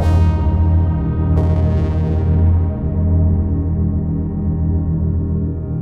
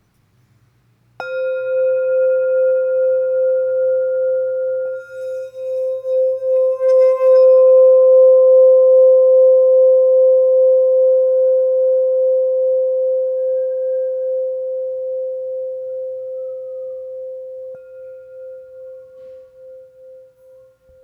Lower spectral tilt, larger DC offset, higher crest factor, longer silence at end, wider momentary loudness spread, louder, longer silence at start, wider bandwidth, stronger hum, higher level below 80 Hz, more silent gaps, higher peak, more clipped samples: first, -10.5 dB/octave vs -5 dB/octave; neither; about the same, 12 dB vs 10 dB; second, 0 s vs 0.85 s; second, 5 LU vs 19 LU; second, -17 LUFS vs -14 LUFS; second, 0 s vs 1.2 s; first, 3.6 kHz vs 2.7 kHz; neither; first, -22 dBFS vs -72 dBFS; neither; about the same, -4 dBFS vs -4 dBFS; neither